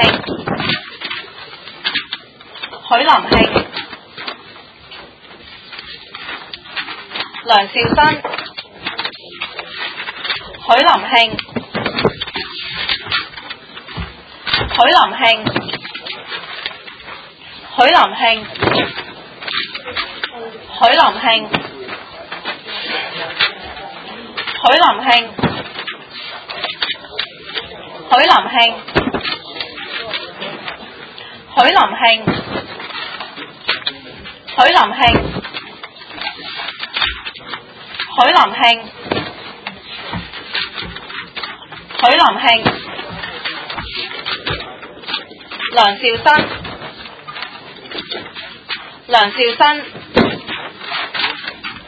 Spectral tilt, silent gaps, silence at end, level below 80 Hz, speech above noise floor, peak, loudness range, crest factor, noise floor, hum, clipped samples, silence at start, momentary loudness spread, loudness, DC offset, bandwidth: -5 dB/octave; none; 0 s; -42 dBFS; 27 dB; 0 dBFS; 4 LU; 18 dB; -39 dBFS; none; under 0.1%; 0 s; 20 LU; -15 LUFS; under 0.1%; 8 kHz